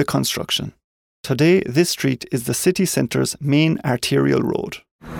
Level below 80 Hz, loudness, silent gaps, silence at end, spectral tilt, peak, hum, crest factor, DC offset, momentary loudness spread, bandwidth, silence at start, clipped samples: -50 dBFS; -19 LUFS; 0.84-1.24 s, 4.91-4.99 s; 0 s; -5 dB/octave; -4 dBFS; none; 16 dB; under 0.1%; 10 LU; 18.5 kHz; 0 s; under 0.1%